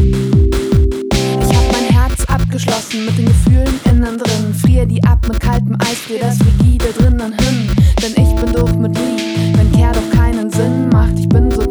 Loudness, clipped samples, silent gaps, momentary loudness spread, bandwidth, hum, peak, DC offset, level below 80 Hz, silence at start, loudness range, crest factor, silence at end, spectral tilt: -13 LUFS; under 0.1%; none; 5 LU; over 20 kHz; none; 0 dBFS; under 0.1%; -16 dBFS; 0 s; 0 LU; 12 dB; 0 s; -6.5 dB/octave